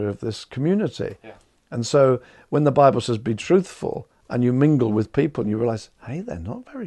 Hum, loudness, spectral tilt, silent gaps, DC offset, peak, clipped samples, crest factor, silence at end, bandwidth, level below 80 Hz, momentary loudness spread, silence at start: none; -22 LUFS; -7 dB/octave; none; under 0.1%; -2 dBFS; under 0.1%; 20 dB; 0 s; 11 kHz; -56 dBFS; 14 LU; 0 s